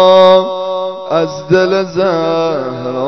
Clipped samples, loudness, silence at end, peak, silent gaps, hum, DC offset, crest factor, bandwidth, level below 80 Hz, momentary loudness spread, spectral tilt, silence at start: 0.5%; -12 LUFS; 0 s; 0 dBFS; none; none; under 0.1%; 12 dB; 6.4 kHz; -56 dBFS; 11 LU; -6 dB/octave; 0 s